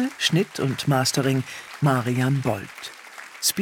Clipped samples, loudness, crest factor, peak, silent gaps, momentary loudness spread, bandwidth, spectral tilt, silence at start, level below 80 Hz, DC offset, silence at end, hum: under 0.1%; -23 LUFS; 16 dB; -6 dBFS; none; 16 LU; 18 kHz; -4.5 dB/octave; 0 s; -62 dBFS; under 0.1%; 0 s; none